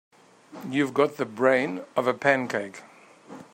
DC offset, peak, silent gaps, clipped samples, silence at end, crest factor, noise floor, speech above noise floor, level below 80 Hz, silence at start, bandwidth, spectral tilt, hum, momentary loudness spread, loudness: under 0.1%; -4 dBFS; none; under 0.1%; 0.1 s; 22 dB; -47 dBFS; 23 dB; -74 dBFS; 0.5 s; 16 kHz; -5.5 dB/octave; none; 18 LU; -25 LUFS